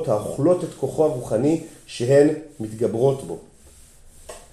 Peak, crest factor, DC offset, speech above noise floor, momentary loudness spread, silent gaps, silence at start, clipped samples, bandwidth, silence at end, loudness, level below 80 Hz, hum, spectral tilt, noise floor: -4 dBFS; 18 dB; under 0.1%; 27 dB; 19 LU; none; 0 s; under 0.1%; 13.5 kHz; 0.1 s; -21 LUFS; -52 dBFS; none; -7 dB/octave; -48 dBFS